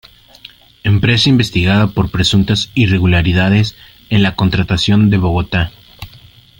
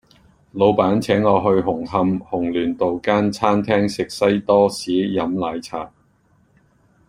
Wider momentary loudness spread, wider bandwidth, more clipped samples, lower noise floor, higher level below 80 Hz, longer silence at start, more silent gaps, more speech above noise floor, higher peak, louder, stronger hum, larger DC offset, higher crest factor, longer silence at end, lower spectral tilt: about the same, 7 LU vs 9 LU; about the same, 16.5 kHz vs 15 kHz; neither; second, -42 dBFS vs -59 dBFS; first, -34 dBFS vs -52 dBFS; first, 0.85 s vs 0.55 s; neither; second, 30 dB vs 40 dB; about the same, 0 dBFS vs -2 dBFS; first, -13 LUFS vs -19 LUFS; neither; neither; second, 12 dB vs 18 dB; second, 0.5 s vs 1.2 s; about the same, -6 dB/octave vs -6.5 dB/octave